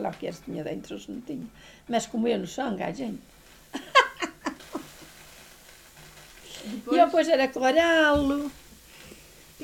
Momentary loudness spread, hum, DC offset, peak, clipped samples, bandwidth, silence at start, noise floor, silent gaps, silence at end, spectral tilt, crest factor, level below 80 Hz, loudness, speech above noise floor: 26 LU; none; under 0.1%; -4 dBFS; under 0.1%; 18 kHz; 0 s; -51 dBFS; none; 0 s; -4 dB/octave; 24 dB; -54 dBFS; -25 LUFS; 25 dB